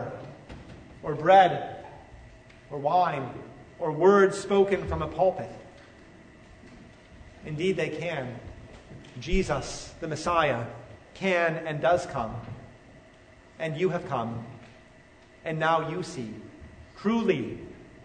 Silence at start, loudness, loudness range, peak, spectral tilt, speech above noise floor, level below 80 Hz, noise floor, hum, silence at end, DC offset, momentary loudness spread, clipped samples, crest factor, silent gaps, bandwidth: 0 s; -27 LUFS; 9 LU; -8 dBFS; -6 dB/octave; 28 dB; -46 dBFS; -54 dBFS; none; 0 s; under 0.1%; 24 LU; under 0.1%; 22 dB; none; 9.6 kHz